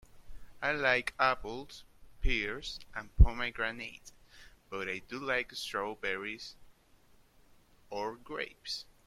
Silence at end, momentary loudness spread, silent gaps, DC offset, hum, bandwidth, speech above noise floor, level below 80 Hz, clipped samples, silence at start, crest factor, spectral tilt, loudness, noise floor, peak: 0.25 s; 16 LU; none; under 0.1%; none; 13.5 kHz; 30 dB; -38 dBFS; under 0.1%; 0.15 s; 26 dB; -5 dB/octave; -34 LUFS; -63 dBFS; -8 dBFS